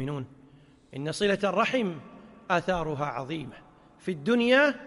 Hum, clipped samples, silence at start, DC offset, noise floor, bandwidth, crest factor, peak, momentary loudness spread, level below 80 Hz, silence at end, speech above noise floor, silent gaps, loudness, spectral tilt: none; under 0.1%; 0 s; under 0.1%; -56 dBFS; 11.5 kHz; 18 dB; -10 dBFS; 21 LU; -56 dBFS; 0 s; 29 dB; none; -27 LUFS; -5.5 dB/octave